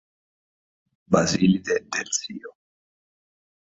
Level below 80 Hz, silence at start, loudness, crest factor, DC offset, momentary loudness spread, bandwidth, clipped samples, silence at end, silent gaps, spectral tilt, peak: -56 dBFS; 1.1 s; -23 LUFS; 24 dB; under 0.1%; 12 LU; 8 kHz; under 0.1%; 1.25 s; none; -4.5 dB/octave; -2 dBFS